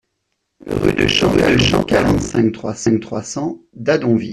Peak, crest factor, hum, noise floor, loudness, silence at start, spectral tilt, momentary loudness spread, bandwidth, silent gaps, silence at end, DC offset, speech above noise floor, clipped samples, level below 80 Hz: -2 dBFS; 14 dB; none; -72 dBFS; -16 LUFS; 0.65 s; -5 dB/octave; 11 LU; 13.5 kHz; none; 0 s; under 0.1%; 56 dB; under 0.1%; -36 dBFS